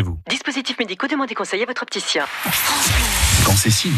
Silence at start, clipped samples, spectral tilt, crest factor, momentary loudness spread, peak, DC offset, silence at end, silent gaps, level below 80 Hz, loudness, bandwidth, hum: 0 s; under 0.1%; -3 dB/octave; 16 dB; 9 LU; -4 dBFS; under 0.1%; 0 s; none; -30 dBFS; -18 LUFS; 14 kHz; none